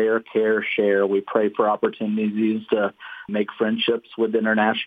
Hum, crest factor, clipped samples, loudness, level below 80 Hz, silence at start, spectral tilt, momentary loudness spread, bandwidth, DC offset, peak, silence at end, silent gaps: none; 16 dB; under 0.1%; -22 LUFS; -72 dBFS; 0 s; -8 dB/octave; 6 LU; 4.9 kHz; under 0.1%; -4 dBFS; 0 s; none